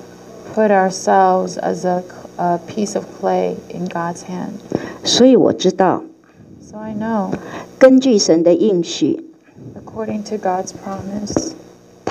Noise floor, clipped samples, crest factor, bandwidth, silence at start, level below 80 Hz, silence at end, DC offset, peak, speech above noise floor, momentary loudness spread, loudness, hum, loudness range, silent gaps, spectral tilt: -43 dBFS; under 0.1%; 16 dB; 12 kHz; 0 s; -54 dBFS; 0 s; under 0.1%; 0 dBFS; 27 dB; 17 LU; -16 LUFS; none; 6 LU; none; -5 dB/octave